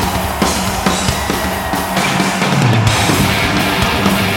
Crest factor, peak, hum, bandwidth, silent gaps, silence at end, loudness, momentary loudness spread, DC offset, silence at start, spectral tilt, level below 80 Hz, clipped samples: 14 dB; 0 dBFS; none; 17 kHz; none; 0 s; -14 LUFS; 5 LU; under 0.1%; 0 s; -4 dB/octave; -28 dBFS; under 0.1%